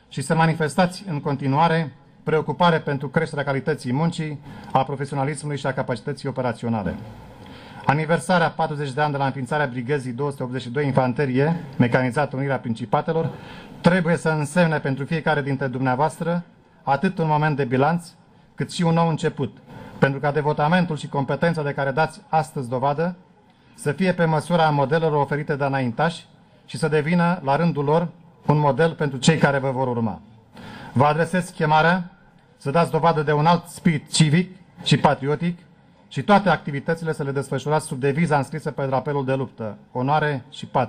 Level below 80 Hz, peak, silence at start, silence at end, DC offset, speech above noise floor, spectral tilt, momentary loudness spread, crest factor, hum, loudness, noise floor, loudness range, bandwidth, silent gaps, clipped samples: -54 dBFS; -6 dBFS; 0.1 s; 0 s; under 0.1%; 32 dB; -6.5 dB/octave; 10 LU; 16 dB; none; -22 LUFS; -53 dBFS; 4 LU; 13.5 kHz; none; under 0.1%